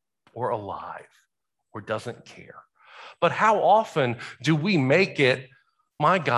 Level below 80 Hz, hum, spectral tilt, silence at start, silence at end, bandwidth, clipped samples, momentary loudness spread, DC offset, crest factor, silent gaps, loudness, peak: -66 dBFS; none; -6 dB/octave; 0.35 s; 0 s; 12 kHz; under 0.1%; 21 LU; under 0.1%; 20 dB; none; -23 LUFS; -6 dBFS